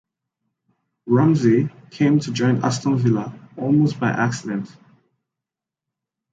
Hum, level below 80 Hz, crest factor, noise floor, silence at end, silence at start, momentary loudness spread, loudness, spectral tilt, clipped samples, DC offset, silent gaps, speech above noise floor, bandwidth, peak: none; -62 dBFS; 16 dB; -87 dBFS; 1.65 s; 1.05 s; 12 LU; -20 LUFS; -7 dB/octave; under 0.1%; under 0.1%; none; 68 dB; 9 kHz; -4 dBFS